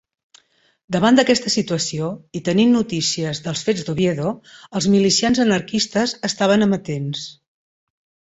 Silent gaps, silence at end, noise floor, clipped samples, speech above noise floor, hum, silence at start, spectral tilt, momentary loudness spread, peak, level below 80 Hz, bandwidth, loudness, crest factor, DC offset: none; 1 s; -56 dBFS; under 0.1%; 38 dB; none; 0.9 s; -4.5 dB/octave; 11 LU; -2 dBFS; -56 dBFS; 8.2 kHz; -19 LUFS; 18 dB; under 0.1%